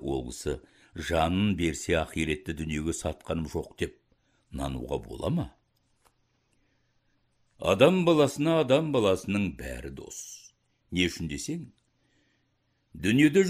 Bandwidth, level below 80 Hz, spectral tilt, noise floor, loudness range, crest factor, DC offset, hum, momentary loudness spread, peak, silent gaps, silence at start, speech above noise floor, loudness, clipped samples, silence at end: 15.5 kHz; -48 dBFS; -5.5 dB/octave; -73 dBFS; 11 LU; 24 dB; under 0.1%; none; 17 LU; -6 dBFS; none; 0 s; 46 dB; -28 LUFS; under 0.1%; 0 s